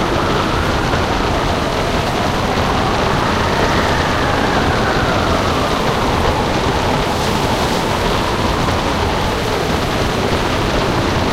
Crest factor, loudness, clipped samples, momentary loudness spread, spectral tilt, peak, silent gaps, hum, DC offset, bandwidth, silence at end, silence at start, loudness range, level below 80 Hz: 14 dB; -16 LUFS; under 0.1%; 2 LU; -5 dB/octave; -2 dBFS; none; none; 0.2%; 16 kHz; 0 s; 0 s; 1 LU; -26 dBFS